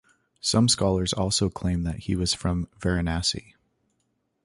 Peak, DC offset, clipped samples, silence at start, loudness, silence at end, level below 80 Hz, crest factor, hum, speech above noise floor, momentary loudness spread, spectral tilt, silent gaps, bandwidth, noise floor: -8 dBFS; under 0.1%; under 0.1%; 0.45 s; -25 LUFS; 1.05 s; -40 dBFS; 20 dB; none; 49 dB; 8 LU; -4.5 dB/octave; none; 11.5 kHz; -74 dBFS